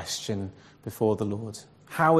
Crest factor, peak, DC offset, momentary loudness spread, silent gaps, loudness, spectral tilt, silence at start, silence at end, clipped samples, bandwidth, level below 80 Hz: 20 dB; -8 dBFS; under 0.1%; 15 LU; none; -30 LUFS; -5 dB/octave; 0 s; 0 s; under 0.1%; 14 kHz; -62 dBFS